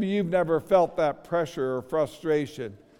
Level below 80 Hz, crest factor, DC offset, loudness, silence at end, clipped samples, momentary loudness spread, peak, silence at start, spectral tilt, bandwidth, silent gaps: -58 dBFS; 18 dB; under 0.1%; -26 LUFS; 0.25 s; under 0.1%; 7 LU; -8 dBFS; 0 s; -7 dB/octave; 16.5 kHz; none